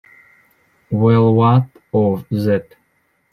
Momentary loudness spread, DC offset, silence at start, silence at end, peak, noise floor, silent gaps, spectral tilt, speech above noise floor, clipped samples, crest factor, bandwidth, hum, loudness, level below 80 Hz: 9 LU; under 0.1%; 0.9 s; 0.7 s; -2 dBFS; -63 dBFS; none; -10 dB/octave; 48 dB; under 0.1%; 16 dB; 5.4 kHz; none; -16 LUFS; -56 dBFS